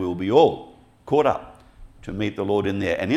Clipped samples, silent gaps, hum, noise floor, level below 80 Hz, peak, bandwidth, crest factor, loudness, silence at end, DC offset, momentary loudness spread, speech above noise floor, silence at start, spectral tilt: under 0.1%; none; none; -46 dBFS; -50 dBFS; -4 dBFS; 10.5 kHz; 20 dB; -22 LUFS; 0 s; under 0.1%; 17 LU; 25 dB; 0 s; -7 dB/octave